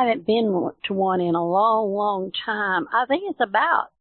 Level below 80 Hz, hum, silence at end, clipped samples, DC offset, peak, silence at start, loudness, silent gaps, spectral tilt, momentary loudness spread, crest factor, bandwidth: -66 dBFS; none; 0.15 s; under 0.1%; under 0.1%; -6 dBFS; 0 s; -22 LUFS; none; -10 dB/octave; 6 LU; 16 dB; 4.4 kHz